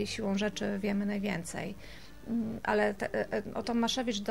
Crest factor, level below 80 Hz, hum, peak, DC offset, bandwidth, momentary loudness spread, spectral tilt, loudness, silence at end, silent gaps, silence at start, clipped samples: 18 dB; -56 dBFS; none; -14 dBFS; 0.3%; 16 kHz; 10 LU; -4.5 dB/octave; -33 LUFS; 0 s; none; 0 s; under 0.1%